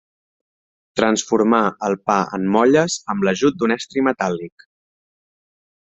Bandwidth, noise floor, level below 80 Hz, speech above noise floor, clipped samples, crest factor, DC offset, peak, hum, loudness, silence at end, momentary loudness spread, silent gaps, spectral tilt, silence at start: 8.4 kHz; under -90 dBFS; -60 dBFS; over 72 dB; under 0.1%; 18 dB; under 0.1%; -2 dBFS; none; -18 LUFS; 1.45 s; 8 LU; none; -4.5 dB/octave; 0.95 s